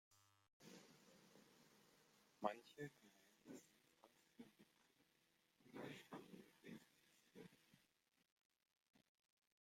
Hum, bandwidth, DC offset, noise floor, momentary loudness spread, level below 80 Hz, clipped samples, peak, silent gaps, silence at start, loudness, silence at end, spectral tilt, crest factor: none; 16 kHz; under 0.1%; -85 dBFS; 17 LU; under -90 dBFS; under 0.1%; -28 dBFS; 0.53-0.60 s, 8.32-8.37 s, 8.45-8.50 s, 8.88-8.93 s; 0.1 s; -58 LUFS; 0.6 s; -5 dB/octave; 34 dB